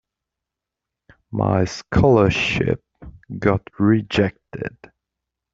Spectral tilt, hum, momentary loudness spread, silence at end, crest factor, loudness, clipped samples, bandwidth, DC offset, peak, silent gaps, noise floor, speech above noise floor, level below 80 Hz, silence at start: -7 dB/octave; none; 16 LU; 0.85 s; 18 dB; -19 LUFS; under 0.1%; 7.8 kHz; under 0.1%; -2 dBFS; none; -85 dBFS; 66 dB; -42 dBFS; 1.3 s